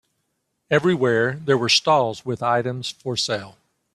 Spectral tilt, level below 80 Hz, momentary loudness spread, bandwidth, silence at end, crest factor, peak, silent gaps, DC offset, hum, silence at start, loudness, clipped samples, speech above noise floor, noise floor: -4 dB/octave; -62 dBFS; 10 LU; 13 kHz; 0.45 s; 18 dB; -4 dBFS; none; under 0.1%; none; 0.7 s; -21 LUFS; under 0.1%; 53 dB; -74 dBFS